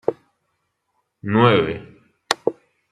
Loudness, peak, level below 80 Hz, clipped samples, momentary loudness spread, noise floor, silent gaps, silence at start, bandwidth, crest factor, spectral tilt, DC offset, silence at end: -20 LUFS; 0 dBFS; -58 dBFS; under 0.1%; 16 LU; -73 dBFS; none; 0.1 s; 13.5 kHz; 22 dB; -5.5 dB/octave; under 0.1%; 0.4 s